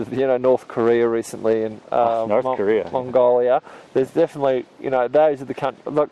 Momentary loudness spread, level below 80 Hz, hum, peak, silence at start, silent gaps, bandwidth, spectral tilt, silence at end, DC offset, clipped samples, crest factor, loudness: 7 LU; -60 dBFS; none; -6 dBFS; 0 s; none; 12.5 kHz; -6.5 dB/octave; 0.05 s; under 0.1%; under 0.1%; 14 dB; -20 LUFS